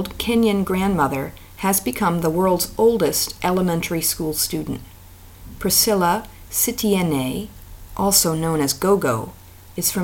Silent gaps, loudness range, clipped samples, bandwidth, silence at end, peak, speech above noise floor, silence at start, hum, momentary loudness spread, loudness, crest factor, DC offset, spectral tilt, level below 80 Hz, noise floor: none; 2 LU; under 0.1%; 17 kHz; 0 s; -2 dBFS; 23 dB; 0 s; none; 11 LU; -19 LUFS; 18 dB; under 0.1%; -4 dB/octave; -42 dBFS; -43 dBFS